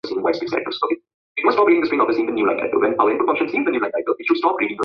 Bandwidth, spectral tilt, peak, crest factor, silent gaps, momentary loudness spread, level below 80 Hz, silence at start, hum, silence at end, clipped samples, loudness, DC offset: 6.2 kHz; -6.5 dB/octave; -2 dBFS; 18 dB; 1.14-1.35 s; 7 LU; -64 dBFS; 0.05 s; none; 0 s; under 0.1%; -19 LUFS; under 0.1%